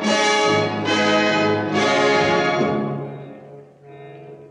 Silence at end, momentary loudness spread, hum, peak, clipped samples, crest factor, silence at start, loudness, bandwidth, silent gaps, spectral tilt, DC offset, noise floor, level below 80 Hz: 0.05 s; 19 LU; none; -6 dBFS; under 0.1%; 14 dB; 0 s; -18 LUFS; 11 kHz; none; -4 dB/octave; under 0.1%; -42 dBFS; -60 dBFS